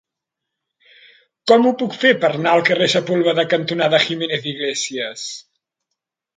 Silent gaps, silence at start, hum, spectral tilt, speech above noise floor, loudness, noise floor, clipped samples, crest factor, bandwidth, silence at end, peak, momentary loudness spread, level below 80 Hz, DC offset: none; 1.45 s; none; -4 dB/octave; 65 dB; -17 LUFS; -82 dBFS; under 0.1%; 20 dB; 9.4 kHz; 0.95 s; 0 dBFS; 12 LU; -68 dBFS; under 0.1%